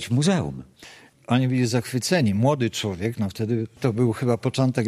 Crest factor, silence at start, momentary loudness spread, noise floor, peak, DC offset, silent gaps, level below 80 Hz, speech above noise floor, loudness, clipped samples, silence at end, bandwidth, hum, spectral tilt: 18 dB; 0 s; 6 LU; -48 dBFS; -6 dBFS; under 0.1%; none; -56 dBFS; 26 dB; -23 LUFS; under 0.1%; 0 s; 14.5 kHz; none; -6 dB/octave